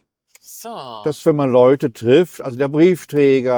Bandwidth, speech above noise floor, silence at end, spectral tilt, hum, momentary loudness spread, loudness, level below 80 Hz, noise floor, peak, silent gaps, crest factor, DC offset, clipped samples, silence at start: over 20 kHz; 34 dB; 0 s; -7 dB/octave; none; 18 LU; -16 LUFS; -62 dBFS; -50 dBFS; -2 dBFS; none; 14 dB; under 0.1%; under 0.1%; 0.5 s